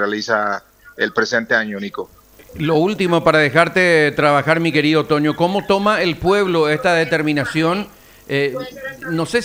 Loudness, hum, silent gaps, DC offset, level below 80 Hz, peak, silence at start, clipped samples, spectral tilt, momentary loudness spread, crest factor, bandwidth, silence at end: -16 LUFS; none; none; under 0.1%; -48 dBFS; 0 dBFS; 0 s; under 0.1%; -5.5 dB/octave; 12 LU; 18 dB; 16 kHz; 0 s